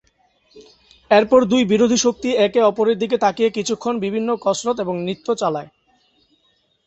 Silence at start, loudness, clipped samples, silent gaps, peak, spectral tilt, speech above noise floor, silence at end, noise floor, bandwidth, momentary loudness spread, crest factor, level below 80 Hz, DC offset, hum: 0.55 s; -18 LUFS; under 0.1%; none; -2 dBFS; -4.5 dB/octave; 45 dB; 1.2 s; -63 dBFS; 8.2 kHz; 8 LU; 18 dB; -58 dBFS; under 0.1%; none